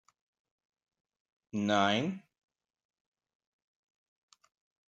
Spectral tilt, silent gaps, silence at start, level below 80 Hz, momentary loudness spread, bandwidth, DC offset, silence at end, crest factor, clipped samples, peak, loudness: -5 dB/octave; none; 1.55 s; -82 dBFS; 14 LU; 7.8 kHz; under 0.1%; 2.7 s; 26 dB; under 0.1%; -14 dBFS; -31 LUFS